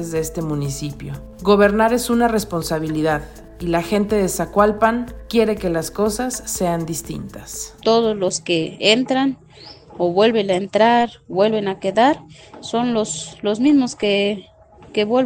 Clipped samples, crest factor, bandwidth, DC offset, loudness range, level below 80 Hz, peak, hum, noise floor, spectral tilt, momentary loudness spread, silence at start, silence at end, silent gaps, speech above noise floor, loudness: under 0.1%; 18 dB; 17 kHz; under 0.1%; 3 LU; -42 dBFS; 0 dBFS; none; -42 dBFS; -4.5 dB/octave; 12 LU; 0 s; 0 s; none; 24 dB; -19 LUFS